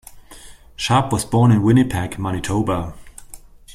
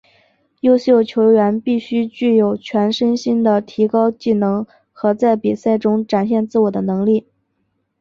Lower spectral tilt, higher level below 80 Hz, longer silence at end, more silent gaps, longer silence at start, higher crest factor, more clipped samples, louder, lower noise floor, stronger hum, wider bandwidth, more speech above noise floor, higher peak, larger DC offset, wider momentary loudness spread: second, -6 dB/octave vs -7.5 dB/octave; first, -42 dBFS vs -60 dBFS; second, 0.35 s vs 0.8 s; neither; second, 0.1 s vs 0.65 s; about the same, 16 dB vs 14 dB; neither; about the same, -18 LUFS vs -16 LUFS; second, -41 dBFS vs -68 dBFS; neither; first, 15 kHz vs 7.2 kHz; second, 24 dB vs 53 dB; about the same, -2 dBFS vs -2 dBFS; neither; first, 11 LU vs 7 LU